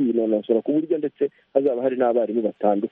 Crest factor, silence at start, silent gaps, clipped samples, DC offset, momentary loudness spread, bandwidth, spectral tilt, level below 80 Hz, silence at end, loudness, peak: 18 dB; 0 s; none; under 0.1%; under 0.1%; 4 LU; 3.9 kHz; -10.5 dB/octave; -70 dBFS; 0.05 s; -22 LUFS; -4 dBFS